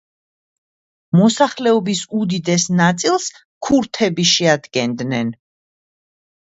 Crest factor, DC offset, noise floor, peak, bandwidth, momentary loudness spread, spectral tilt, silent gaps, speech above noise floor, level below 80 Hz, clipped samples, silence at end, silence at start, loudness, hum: 18 dB; under 0.1%; under -90 dBFS; 0 dBFS; 8 kHz; 8 LU; -4.5 dB/octave; 3.45-3.61 s; over 74 dB; -56 dBFS; under 0.1%; 1.15 s; 1.15 s; -17 LUFS; none